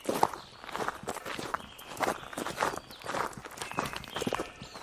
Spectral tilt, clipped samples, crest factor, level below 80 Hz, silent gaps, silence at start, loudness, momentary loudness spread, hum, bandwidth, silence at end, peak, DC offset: -3.5 dB/octave; under 0.1%; 28 dB; -60 dBFS; none; 0 s; -36 LUFS; 8 LU; none; 16 kHz; 0 s; -8 dBFS; under 0.1%